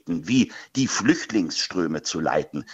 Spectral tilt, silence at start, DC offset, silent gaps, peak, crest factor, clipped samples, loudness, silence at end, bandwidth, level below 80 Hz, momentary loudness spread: -4 dB/octave; 0.05 s; under 0.1%; none; -4 dBFS; 20 dB; under 0.1%; -24 LUFS; 0 s; 8.2 kHz; -58 dBFS; 4 LU